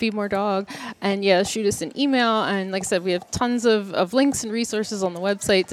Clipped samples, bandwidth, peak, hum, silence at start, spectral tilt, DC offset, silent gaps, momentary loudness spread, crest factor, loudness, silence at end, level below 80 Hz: under 0.1%; 15 kHz; -4 dBFS; none; 0 s; -4 dB/octave; under 0.1%; none; 6 LU; 18 dB; -22 LUFS; 0 s; -56 dBFS